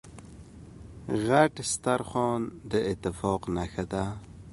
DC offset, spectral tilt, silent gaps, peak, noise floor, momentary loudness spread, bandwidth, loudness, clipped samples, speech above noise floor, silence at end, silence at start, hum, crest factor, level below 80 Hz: under 0.1%; -5 dB/octave; none; -6 dBFS; -47 dBFS; 24 LU; 11.5 kHz; -29 LUFS; under 0.1%; 19 dB; 0 s; 0.05 s; none; 24 dB; -50 dBFS